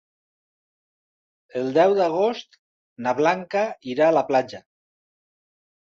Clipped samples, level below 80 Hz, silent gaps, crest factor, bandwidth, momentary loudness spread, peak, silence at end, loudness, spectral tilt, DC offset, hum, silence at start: under 0.1%; -72 dBFS; 2.59-2.96 s; 20 dB; 7.4 kHz; 15 LU; -4 dBFS; 1.25 s; -22 LUFS; -5.5 dB/octave; under 0.1%; none; 1.55 s